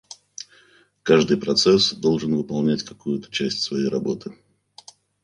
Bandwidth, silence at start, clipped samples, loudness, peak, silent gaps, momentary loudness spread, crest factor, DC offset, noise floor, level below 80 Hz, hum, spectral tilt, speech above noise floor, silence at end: 10.5 kHz; 1.05 s; under 0.1%; -21 LUFS; -2 dBFS; none; 21 LU; 20 dB; under 0.1%; -56 dBFS; -58 dBFS; none; -4.5 dB/octave; 35 dB; 0.9 s